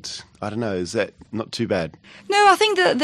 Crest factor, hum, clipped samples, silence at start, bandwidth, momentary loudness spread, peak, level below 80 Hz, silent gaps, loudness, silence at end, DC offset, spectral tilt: 18 dB; none; under 0.1%; 0.05 s; 13 kHz; 16 LU; -4 dBFS; -58 dBFS; none; -20 LUFS; 0 s; under 0.1%; -4 dB/octave